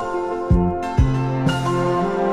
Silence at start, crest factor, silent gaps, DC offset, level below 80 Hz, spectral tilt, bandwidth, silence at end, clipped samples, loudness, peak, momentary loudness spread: 0 s; 14 dB; none; under 0.1%; -28 dBFS; -7.5 dB/octave; 11.5 kHz; 0 s; under 0.1%; -20 LUFS; -4 dBFS; 2 LU